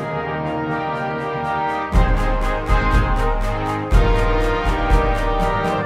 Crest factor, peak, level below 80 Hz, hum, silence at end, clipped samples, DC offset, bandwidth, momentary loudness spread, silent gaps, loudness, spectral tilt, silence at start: 16 dB; -2 dBFS; -20 dBFS; none; 0 s; under 0.1%; under 0.1%; 10.5 kHz; 5 LU; none; -20 LUFS; -6.5 dB/octave; 0 s